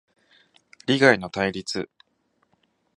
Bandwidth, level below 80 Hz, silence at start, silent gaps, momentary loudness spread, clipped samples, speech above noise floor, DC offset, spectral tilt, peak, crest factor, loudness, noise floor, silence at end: 11 kHz; -60 dBFS; 0.9 s; none; 16 LU; under 0.1%; 48 dB; under 0.1%; -4.5 dB/octave; -2 dBFS; 24 dB; -22 LUFS; -70 dBFS; 1.1 s